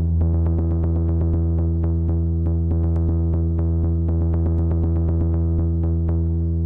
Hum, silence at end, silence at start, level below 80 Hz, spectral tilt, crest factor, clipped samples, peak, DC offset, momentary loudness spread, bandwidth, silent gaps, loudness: none; 0 s; 0 s; -28 dBFS; -13.5 dB/octave; 6 dB; under 0.1%; -12 dBFS; under 0.1%; 1 LU; 1.7 kHz; none; -21 LUFS